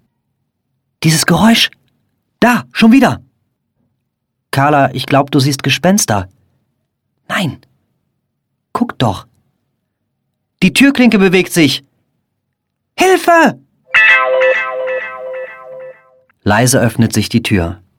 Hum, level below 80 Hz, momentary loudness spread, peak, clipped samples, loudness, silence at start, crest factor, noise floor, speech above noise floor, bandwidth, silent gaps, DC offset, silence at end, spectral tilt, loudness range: none; -44 dBFS; 16 LU; 0 dBFS; under 0.1%; -11 LUFS; 1 s; 14 dB; -71 dBFS; 60 dB; 17 kHz; none; under 0.1%; 0.25 s; -4.5 dB/octave; 9 LU